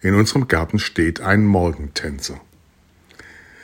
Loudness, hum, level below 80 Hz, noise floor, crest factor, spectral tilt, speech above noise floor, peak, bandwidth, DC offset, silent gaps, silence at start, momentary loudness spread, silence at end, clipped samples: -19 LUFS; none; -40 dBFS; -54 dBFS; 18 dB; -5.5 dB/octave; 36 dB; 0 dBFS; 16.5 kHz; under 0.1%; none; 0.05 s; 13 LU; 1.25 s; under 0.1%